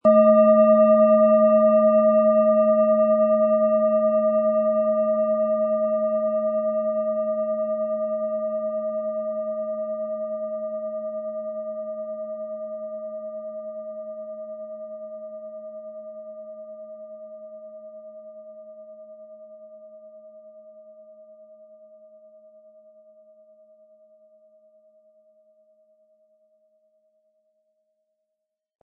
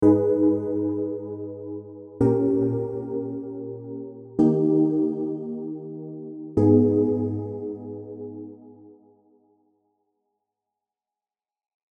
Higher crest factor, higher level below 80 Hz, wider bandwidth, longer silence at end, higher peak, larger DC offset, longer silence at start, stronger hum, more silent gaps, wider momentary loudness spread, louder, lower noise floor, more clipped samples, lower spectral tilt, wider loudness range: about the same, 18 dB vs 20 dB; second, -82 dBFS vs -58 dBFS; first, 2.9 kHz vs 2.2 kHz; first, 7.8 s vs 3 s; about the same, -6 dBFS vs -6 dBFS; neither; about the same, 0.05 s vs 0 s; neither; neither; first, 25 LU vs 18 LU; first, -21 LUFS vs -24 LUFS; second, -82 dBFS vs under -90 dBFS; neither; about the same, -12 dB/octave vs -12 dB/octave; first, 24 LU vs 14 LU